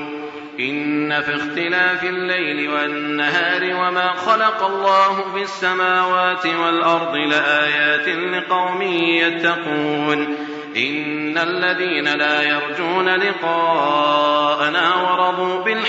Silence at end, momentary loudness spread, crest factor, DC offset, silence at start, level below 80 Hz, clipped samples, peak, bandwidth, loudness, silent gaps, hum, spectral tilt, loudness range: 0 s; 5 LU; 16 dB; under 0.1%; 0 s; -70 dBFS; under 0.1%; -2 dBFS; 8 kHz; -18 LUFS; none; none; -4.5 dB/octave; 2 LU